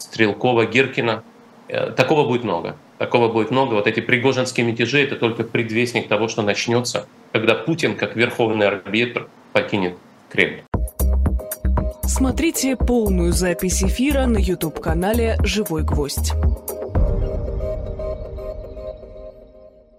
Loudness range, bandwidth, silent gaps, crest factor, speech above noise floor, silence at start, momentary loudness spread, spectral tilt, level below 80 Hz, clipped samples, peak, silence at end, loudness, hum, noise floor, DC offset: 4 LU; 16 kHz; 10.68-10.72 s; 20 dB; 27 dB; 0 s; 11 LU; -5 dB/octave; -28 dBFS; under 0.1%; 0 dBFS; 0.3 s; -20 LUFS; none; -46 dBFS; under 0.1%